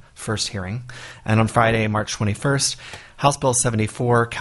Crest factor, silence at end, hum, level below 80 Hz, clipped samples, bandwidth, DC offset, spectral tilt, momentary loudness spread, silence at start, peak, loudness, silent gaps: 20 dB; 0 s; none; -46 dBFS; under 0.1%; 11.5 kHz; under 0.1%; -4.5 dB/octave; 14 LU; 0.2 s; -2 dBFS; -20 LUFS; none